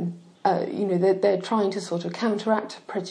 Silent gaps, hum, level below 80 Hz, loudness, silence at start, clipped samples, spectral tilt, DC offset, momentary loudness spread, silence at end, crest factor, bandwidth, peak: none; none; -80 dBFS; -25 LUFS; 0 s; under 0.1%; -6.5 dB/octave; under 0.1%; 9 LU; 0 s; 16 dB; 10.5 kHz; -8 dBFS